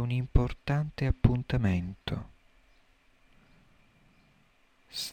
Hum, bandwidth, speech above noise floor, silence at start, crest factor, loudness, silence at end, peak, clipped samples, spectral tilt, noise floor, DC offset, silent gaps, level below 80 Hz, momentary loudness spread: none; 17 kHz; 37 dB; 0 s; 24 dB; -31 LUFS; 0 s; -6 dBFS; under 0.1%; -6.5 dB/octave; -65 dBFS; under 0.1%; none; -38 dBFS; 11 LU